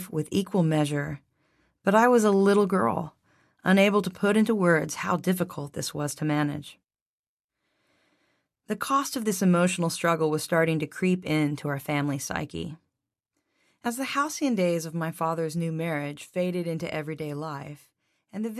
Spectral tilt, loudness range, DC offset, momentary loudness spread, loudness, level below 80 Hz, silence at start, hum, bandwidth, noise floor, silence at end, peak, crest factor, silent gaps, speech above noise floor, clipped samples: -5.5 dB/octave; 8 LU; under 0.1%; 14 LU; -26 LUFS; -62 dBFS; 0 s; none; 14 kHz; -83 dBFS; 0 s; -8 dBFS; 18 dB; 7.01-7.38 s, 7.44-7.48 s; 58 dB; under 0.1%